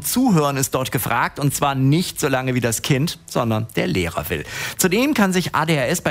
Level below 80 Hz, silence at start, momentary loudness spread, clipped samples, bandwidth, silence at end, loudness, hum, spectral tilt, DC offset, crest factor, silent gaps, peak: -48 dBFS; 0 s; 6 LU; under 0.1%; 16 kHz; 0 s; -19 LUFS; none; -4.5 dB/octave; under 0.1%; 16 dB; none; -2 dBFS